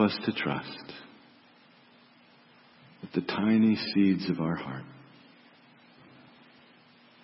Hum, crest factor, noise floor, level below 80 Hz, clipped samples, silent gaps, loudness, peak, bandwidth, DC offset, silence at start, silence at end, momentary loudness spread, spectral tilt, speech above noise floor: none; 20 dB; -59 dBFS; -70 dBFS; under 0.1%; none; -28 LUFS; -12 dBFS; 5.8 kHz; under 0.1%; 0 s; 2.25 s; 21 LU; -10 dB/octave; 31 dB